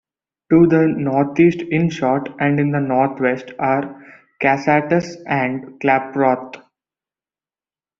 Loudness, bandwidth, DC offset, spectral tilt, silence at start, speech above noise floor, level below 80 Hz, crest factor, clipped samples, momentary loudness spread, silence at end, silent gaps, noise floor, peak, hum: -17 LUFS; 7.2 kHz; under 0.1%; -6.5 dB/octave; 0.5 s; over 73 dB; -56 dBFS; 16 dB; under 0.1%; 8 LU; 1.4 s; none; under -90 dBFS; -2 dBFS; none